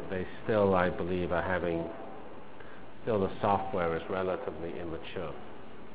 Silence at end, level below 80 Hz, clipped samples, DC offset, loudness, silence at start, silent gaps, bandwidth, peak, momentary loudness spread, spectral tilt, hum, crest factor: 0 s; -52 dBFS; under 0.1%; 0.9%; -32 LUFS; 0 s; none; 4 kHz; -10 dBFS; 20 LU; -5.5 dB/octave; none; 22 dB